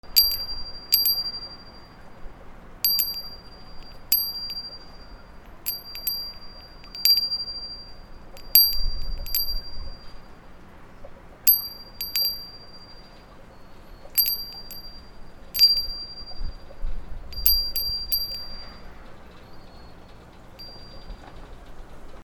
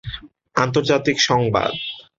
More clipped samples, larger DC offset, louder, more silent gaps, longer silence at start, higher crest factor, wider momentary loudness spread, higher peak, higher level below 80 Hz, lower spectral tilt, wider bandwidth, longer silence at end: neither; neither; second, -22 LUFS vs -19 LUFS; neither; about the same, 0.05 s vs 0.05 s; first, 28 dB vs 18 dB; first, 26 LU vs 13 LU; about the same, 0 dBFS vs -2 dBFS; first, -38 dBFS vs -46 dBFS; second, -1 dB/octave vs -4.5 dB/octave; first, over 20 kHz vs 7.8 kHz; second, 0 s vs 0.2 s